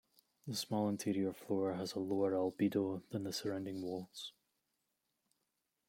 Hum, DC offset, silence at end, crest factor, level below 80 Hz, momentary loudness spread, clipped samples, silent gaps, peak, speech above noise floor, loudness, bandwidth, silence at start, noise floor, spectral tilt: none; under 0.1%; 1.6 s; 18 dB; -82 dBFS; 9 LU; under 0.1%; none; -22 dBFS; 48 dB; -39 LUFS; 16.5 kHz; 0.45 s; -86 dBFS; -5.5 dB/octave